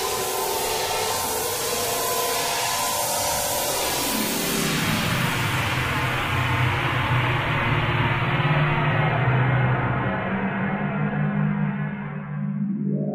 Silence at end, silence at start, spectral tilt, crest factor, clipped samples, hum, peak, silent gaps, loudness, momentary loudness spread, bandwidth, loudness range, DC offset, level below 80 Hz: 0 s; 0 s; -4 dB/octave; 16 dB; under 0.1%; none; -8 dBFS; none; -23 LUFS; 4 LU; 16 kHz; 2 LU; under 0.1%; -44 dBFS